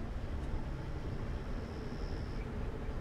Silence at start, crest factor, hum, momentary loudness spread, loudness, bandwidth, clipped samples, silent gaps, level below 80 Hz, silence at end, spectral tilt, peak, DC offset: 0 s; 14 dB; none; 1 LU; -42 LUFS; 10.5 kHz; under 0.1%; none; -42 dBFS; 0 s; -7.5 dB/octave; -26 dBFS; under 0.1%